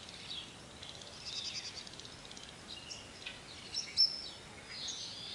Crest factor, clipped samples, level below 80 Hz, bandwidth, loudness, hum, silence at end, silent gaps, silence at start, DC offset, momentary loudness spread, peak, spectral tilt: 24 dB; under 0.1%; -68 dBFS; 11.5 kHz; -39 LUFS; none; 0 s; none; 0 s; under 0.1%; 19 LU; -18 dBFS; -1 dB/octave